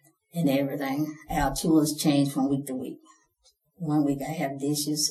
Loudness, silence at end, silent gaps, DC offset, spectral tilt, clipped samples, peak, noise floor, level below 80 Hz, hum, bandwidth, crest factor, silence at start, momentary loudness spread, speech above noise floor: -27 LUFS; 0 s; none; under 0.1%; -5 dB/octave; under 0.1%; -12 dBFS; -67 dBFS; -48 dBFS; none; 13.5 kHz; 16 dB; 0.35 s; 12 LU; 40 dB